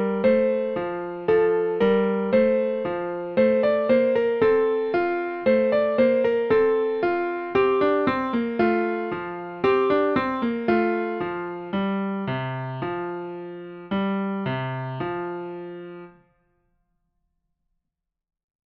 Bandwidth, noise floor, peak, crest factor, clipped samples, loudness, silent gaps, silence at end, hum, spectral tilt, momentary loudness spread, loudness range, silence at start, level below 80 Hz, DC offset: 5.6 kHz; -83 dBFS; -8 dBFS; 16 dB; under 0.1%; -23 LUFS; none; 2.65 s; none; -9 dB/octave; 11 LU; 9 LU; 0 s; -58 dBFS; under 0.1%